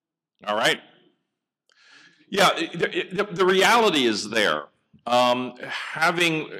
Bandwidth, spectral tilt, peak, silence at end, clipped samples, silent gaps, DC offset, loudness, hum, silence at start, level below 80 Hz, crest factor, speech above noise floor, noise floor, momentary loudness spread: 16.5 kHz; -3 dB/octave; -8 dBFS; 0 s; under 0.1%; none; under 0.1%; -22 LUFS; none; 0.45 s; -70 dBFS; 16 dB; 59 dB; -81 dBFS; 12 LU